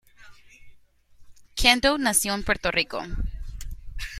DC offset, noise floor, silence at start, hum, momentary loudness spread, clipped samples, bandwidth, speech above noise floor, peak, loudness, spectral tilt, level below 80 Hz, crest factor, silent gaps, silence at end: under 0.1%; -53 dBFS; 0.2 s; none; 22 LU; under 0.1%; 16 kHz; 30 dB; -2 dBFS; -22 LUFS; -2 dB/octave; -36 dBFS; 24 dB; none; 0 s